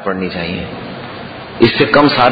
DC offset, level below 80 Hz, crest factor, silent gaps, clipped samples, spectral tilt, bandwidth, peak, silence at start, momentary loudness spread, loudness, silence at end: under 0.1%; -44 dBFS; 14 dB; none; 0.2%; -8 dB/octave; 6 kHz; 0 dBFS; 0 s; 18 LU; -13 LUFS; 0 s